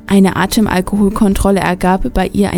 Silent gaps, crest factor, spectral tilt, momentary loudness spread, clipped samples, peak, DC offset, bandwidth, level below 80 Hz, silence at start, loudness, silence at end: none; 12 dB; -6 dB/octave; 3 LU; under 0.1%; 0 dBFS; under 0.1%; 18 kHz; -26 dBFS; 0.05 s; -13 LUFS; 0 s